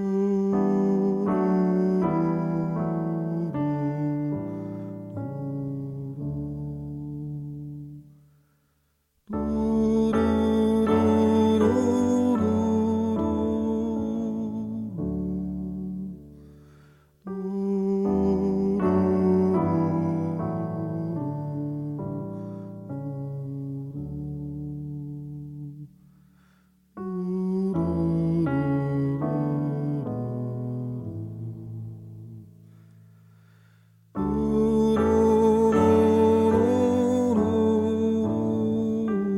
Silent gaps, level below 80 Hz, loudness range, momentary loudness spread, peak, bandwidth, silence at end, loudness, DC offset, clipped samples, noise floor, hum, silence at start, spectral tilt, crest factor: none; -48 dBFS; 14 LU; 15 LU; -8 dBFS; 11.5 kHz; 0 s; -25 LUFS; under 0.1%; under 0.1%; -70 dBFS; none; 0 s; -9 dB/octave; 16 dB